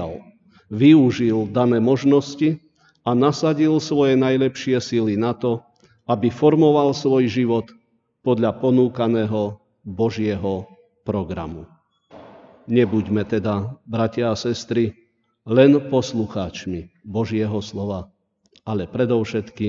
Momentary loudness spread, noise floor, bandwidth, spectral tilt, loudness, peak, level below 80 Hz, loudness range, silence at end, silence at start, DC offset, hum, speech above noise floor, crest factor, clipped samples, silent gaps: 14 LU; -59 dBFS; 7.6 kHz; -7 dB/octave; -20 LUFS; -2 dBFS; -54 dBFS; 6 LU; 0 s; 0 s; under 0.1%; none; 40 dB; 18 dB; under 0.1%; none